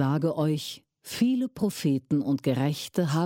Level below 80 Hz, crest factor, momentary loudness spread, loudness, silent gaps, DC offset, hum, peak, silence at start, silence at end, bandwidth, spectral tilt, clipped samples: -66 dBFS; 14 dB; 7 LU; -27 LUFS; none; under 0.1%; none; -12 dBFS; 0 s; 0 s; 17 kHz; -6.5 dB/octave; under 0.1%